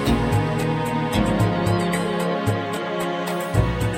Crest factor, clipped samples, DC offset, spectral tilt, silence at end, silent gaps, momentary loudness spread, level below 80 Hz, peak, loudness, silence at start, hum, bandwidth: 16 dB; under 0.1%; under 0.1%; -6 dB/octave; 0 s; none; 5 LU; -34 dBFS; -6 dBFS; -22 LUFS; 0 s; none; 17 kHz